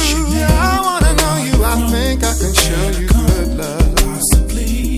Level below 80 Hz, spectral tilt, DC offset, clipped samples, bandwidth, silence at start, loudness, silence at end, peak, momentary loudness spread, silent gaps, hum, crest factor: -16 dBFS; -4 dB/octave; under 0.1%; under 0.1%; 16 kHz; 0 s; -14 LUFS; 0 s; 0 dBFS; 4 LU; none; none; 14 dB